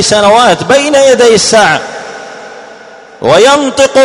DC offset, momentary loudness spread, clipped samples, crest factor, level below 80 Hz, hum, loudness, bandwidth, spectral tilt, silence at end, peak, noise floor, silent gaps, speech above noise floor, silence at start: 0.2%; 19 LU; 3%; 8 dB; -44 dBFS; none; -6 LUFS; 13 kHz; -2.5 dB/octave; 0 s; 0 dBFS; -32 dBFS; none; 26 dB; 0 s